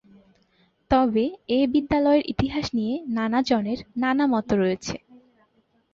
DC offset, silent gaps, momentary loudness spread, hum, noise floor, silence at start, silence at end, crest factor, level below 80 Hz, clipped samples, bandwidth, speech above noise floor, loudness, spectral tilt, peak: under 0.1%; none; 7 LU; none; -65 dBFS; 0.9 s; 0.95 s; 16 dB; -46 dBFS; under 0.1%; 7.6 kHz; 43 dB; -23 LUFS; -6 dB/octave; -8 dBFS